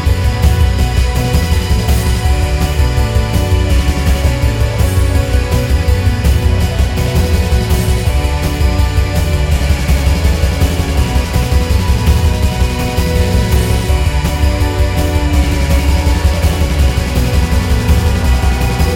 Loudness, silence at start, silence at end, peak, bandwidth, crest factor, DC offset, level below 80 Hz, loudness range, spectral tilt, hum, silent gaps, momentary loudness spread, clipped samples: -13 LUFS; 0 s; 0 s; 0 dBFS; 16.5 kHz; 10 dB; under 0.1%; -14 dBFS; 1 LU; -5.5 dB/octave; none; none; 2 LU; under 0.1%